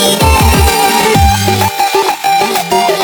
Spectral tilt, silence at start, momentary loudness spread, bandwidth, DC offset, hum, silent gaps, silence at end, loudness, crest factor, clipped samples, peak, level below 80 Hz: -4 dB/octave; 0 s; 3 LU; over 20 kHz; under 0.1%; none; none; 0 s; -9 LUFS; 10 dB; under 0.1%; 0 dBFS; -18 dBFS